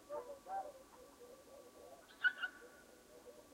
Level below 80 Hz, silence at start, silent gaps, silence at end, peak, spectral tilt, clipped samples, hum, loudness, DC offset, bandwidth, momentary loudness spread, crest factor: -80 dBFS; 0 s; none; 0 s; -24 dBFS; -1.5 dB/octave; under 0.1%; none; -43 LUFS; under 0.1%; 16 kHz; 22 LU; 24 dB